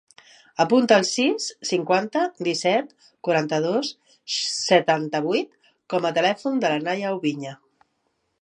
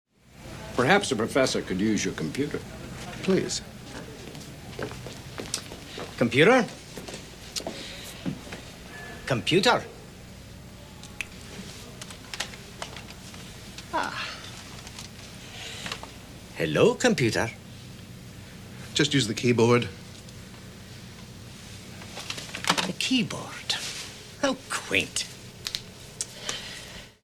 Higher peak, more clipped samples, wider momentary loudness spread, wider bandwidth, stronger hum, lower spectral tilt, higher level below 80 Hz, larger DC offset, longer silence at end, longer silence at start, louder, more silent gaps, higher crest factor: first, -2 dBFS vs -6 dBFS; neither; second, 13 LU vs 21 LU; second, 10.5 kHz vs 17.5 kHz; neither; about the same, -4 dB/octave vs -4 dB/octave; second, -76 dBFS vs -54 dBFS; neither; first, 0.85 s vs 0.1 s; first, 0.6 s vs 0.3 s; first, -22 LUFS vs -27 LUFS; neither; about the same, 20 dB vs 24 dB